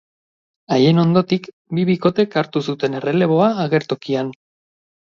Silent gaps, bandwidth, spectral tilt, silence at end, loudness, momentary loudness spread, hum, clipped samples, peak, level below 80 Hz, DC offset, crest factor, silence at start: 1.53-1.65 s; 7 kHz; -7.5 dB/octave; 0.8 s; -18 LUFS; 8 LU; none; under 0.1%; -2 dBFS; -62 dBFS; under 0.1%; 16 dB; 0.7 s